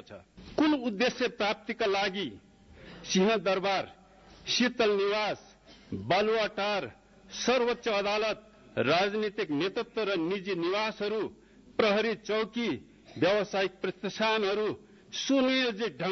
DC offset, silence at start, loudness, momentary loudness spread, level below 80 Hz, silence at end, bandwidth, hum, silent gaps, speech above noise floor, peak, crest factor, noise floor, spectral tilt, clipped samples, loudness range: under 0.1%; 0.1 s; -29 LUFS; 13 LU; -64 dBFS; 0 s; 6.6 kHz; none; none; 25 dB; -12 dBFS; 18 dB; -54 dBFS; -4 dB/octave; under 0.1%; 1 LU